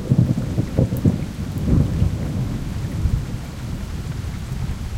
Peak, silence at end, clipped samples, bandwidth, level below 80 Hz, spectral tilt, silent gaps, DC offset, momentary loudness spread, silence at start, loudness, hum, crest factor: -4 dBFS; 0 s; under 0.1%; 16.5 kHz; -28 dBFS; -8 dB/octave; none; under 0.1%; 10 LU; 0 s; -23 LUFS; none; 18 dB